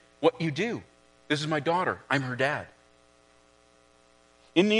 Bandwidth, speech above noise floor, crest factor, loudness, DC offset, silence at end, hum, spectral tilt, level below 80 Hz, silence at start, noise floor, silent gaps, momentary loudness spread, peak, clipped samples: 10.5 kHz; 33 dB; 24 dB; -28 LUFS; under 0.1%; 0 s; 60 Hz at -60 dBFS; -5.5 dB/octave; -70 dBFS; 0.2 s; -61 dBFS; none; 7 LU; -6 dBFS; under 0.1%